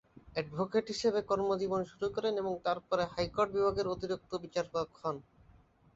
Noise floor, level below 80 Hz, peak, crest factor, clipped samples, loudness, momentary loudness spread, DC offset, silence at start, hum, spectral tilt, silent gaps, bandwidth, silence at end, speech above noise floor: -63 dBFS; -62 dBFS; -16 dBFS; 18 dB; under 0.1%; -34 LUFS; 7 LU; under 0.1%; 0.25 s; none; -5.5 dB/octave; none; 8 kHz; 0.75 s; 29 dB